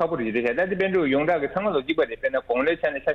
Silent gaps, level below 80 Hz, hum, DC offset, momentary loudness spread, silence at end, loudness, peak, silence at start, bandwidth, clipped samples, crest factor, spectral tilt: none; -54 dBFS; none; under 0.1%; 3 LU; 0 s; -24 LUFS; -10 dBFS; 0 s; 6.4 kHz; under 0.1%; 14 dB; -7.5 dB/octave